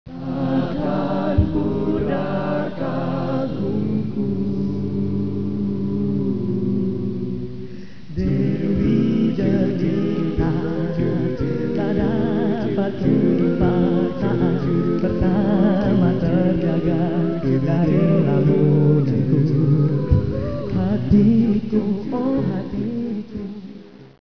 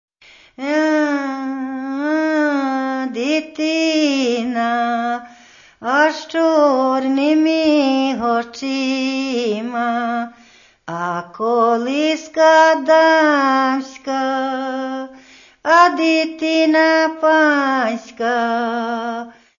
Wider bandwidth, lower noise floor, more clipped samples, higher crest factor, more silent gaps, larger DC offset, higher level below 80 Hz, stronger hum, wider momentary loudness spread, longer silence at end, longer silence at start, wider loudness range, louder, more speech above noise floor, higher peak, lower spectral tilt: second, 5.4 kHz vs 7.4 kHz; second, -40 dBFS vs -49 dBFS; neither; about the same, 16 dB vs 16 dB; neither; first, 2% vs under 0.1%; first, -36 dBFS vs -64 dBFS; neither; second, 8 LU vs 12 LU; second, 0.1 s vs 0.3 s; second, 0.05 s vs 0.6 s; about the same, 5 LU vs 5 LU; second, -20 LUFS vs -17 LUFS; second, 20 dB vs 33 dB; about the same, -4 dBFS vs -2 dBFS; first, -10.5 dB/octave vs -3.5 dB/octave